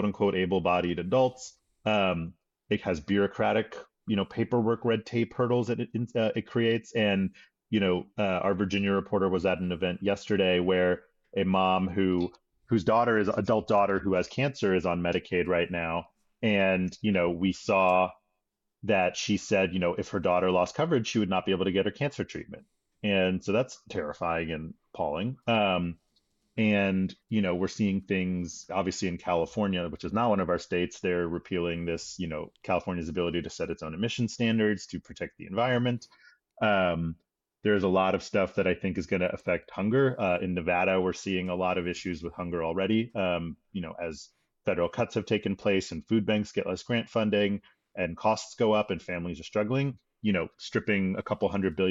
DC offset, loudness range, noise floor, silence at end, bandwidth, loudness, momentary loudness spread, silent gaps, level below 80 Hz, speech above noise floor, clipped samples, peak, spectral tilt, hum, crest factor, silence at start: under 0.1%; 4 LU; -82 dBFS; 0 s; 8 kHz; -28 LUFS; 9 LU; none; -60 dBFS; 54 dB; under 0.1%; -14 dBFS; -6 dB/octave; none; 14 dB; 0 s